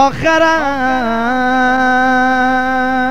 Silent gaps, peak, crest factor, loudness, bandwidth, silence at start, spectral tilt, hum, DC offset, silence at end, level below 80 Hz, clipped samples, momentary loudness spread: none; 0 dBFS; 12 dB; -12 LUFS; 13 kHz; 0 s; -4.5 dB/octave; 50 Hz at -35 dBFS; 4%; 0 s; -38 dBFS; under 0.1%; 4 LU